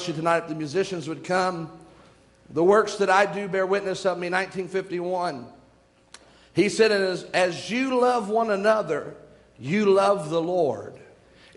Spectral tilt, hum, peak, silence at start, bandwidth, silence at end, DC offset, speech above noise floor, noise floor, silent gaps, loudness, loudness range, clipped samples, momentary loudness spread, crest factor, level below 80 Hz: -5 dB/octave; none; -6 dBFS; 0 s; 11.5 kHz; 0.5 s; under 0.1%; 35 dB; -58 dBFS; none; -24 LUFS; 3 LU; under 0.1%; 11 LU; 20 dB; -64 dBFS